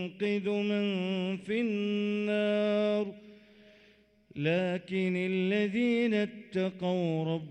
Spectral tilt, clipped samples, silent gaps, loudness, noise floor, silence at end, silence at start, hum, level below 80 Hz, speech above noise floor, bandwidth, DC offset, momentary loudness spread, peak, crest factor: -7.5 dB/octave; under 0.1%; none; -31 LUFS; -63 dBFS; 0 s; 0 s; none; -74 dBFS; 32 dB; 9 kHz; under 0.1%; 5 LU; -18 dBFS; 14 dB